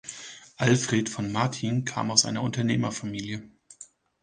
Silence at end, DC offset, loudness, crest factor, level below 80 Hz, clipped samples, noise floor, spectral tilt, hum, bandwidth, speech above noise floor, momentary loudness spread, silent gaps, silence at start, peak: 0.4 s; under 0.1%; -26 LUFS; 24 dB; -60 dBFS; under 0.1%; -52 dBFS; -4 dB/octave; none; 10 kHz; 26 dB; 19 LU; none; 0.05 s; -4 dBFS